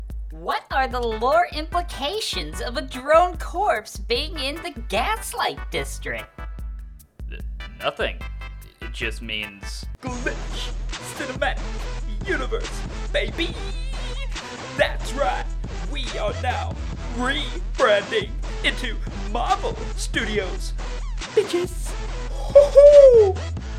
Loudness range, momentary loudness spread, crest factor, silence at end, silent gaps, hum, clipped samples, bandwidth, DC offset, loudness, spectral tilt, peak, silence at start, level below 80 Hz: 8 LU; 14 LU; 20 dB; 0 s; none; none; under 0.1%; 15.5 kHz; under 0.1%; -22 LUFS; -4.5 dB/octave; -2 dBFS; 0 s; -30 dBFS